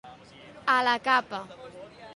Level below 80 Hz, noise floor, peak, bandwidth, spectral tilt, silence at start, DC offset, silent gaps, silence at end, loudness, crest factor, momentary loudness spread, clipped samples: -68 dBFS; -49 dBFS; -8 dBFS; 11.5 kHz; -3 dB/octave; 0.05 s; under 0.1%; none; 0.05 s; -25 LUFS; 20 dB; 22 LU; under 0.1%